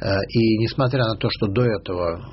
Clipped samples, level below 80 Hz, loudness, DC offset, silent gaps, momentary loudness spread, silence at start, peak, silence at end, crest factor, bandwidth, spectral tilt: under 0.1%; -44 dBFS; -21 LUFS; under 0.1%; none; 5 LU; 0 s; -8 dBFS; 0 s; 14 dB; 6 kHz; -5.5 dB/octave